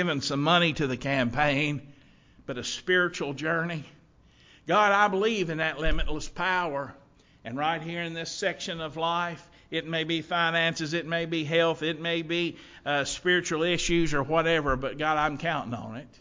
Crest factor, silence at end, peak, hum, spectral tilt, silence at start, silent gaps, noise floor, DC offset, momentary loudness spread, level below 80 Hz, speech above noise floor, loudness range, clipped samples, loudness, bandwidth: 20 dB; 0.15 s; -8 dBFS; none; -4.5 dB/octave; 0 s; none; -58 dBFS; under 0.1%; 11 LU; -44 dBFS; 31 dB; 4 LU; under 0.1%; -27 LUFS; 7.6 kHz